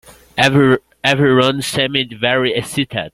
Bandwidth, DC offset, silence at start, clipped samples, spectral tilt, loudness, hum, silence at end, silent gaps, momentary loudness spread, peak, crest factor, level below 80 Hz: 15.5 kHz; under 0.1%; 0.35 s; under 0.1%; -5 dB/octave; -15 LUFS; none; 0.05 s; none; 7 LU; 0 dBFS; 14 dB; -48 dBFS